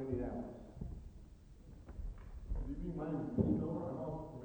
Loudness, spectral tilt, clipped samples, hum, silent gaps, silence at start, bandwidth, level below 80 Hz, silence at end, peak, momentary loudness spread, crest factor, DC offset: -42 LUFS; -10.5 dB/octave; under 0.1%; none; none; 0 s; over 20 kHz; -48 dBFS; 0 s; -22 dBFS; 22 LU; 20 dB; under 0.1%